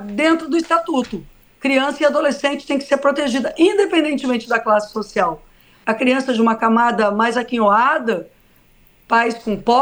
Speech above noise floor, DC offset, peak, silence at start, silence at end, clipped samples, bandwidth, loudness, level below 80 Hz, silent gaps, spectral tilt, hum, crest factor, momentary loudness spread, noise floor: 35 dB; under 0.1%; -2 dBFS; 0 s; 0 s; under 0.1%; over 20 kHz; -17 LUFS; -52 dBFS; none; -4.5 dB/octave; none; 16 dB; 8 LU; -52 dBFS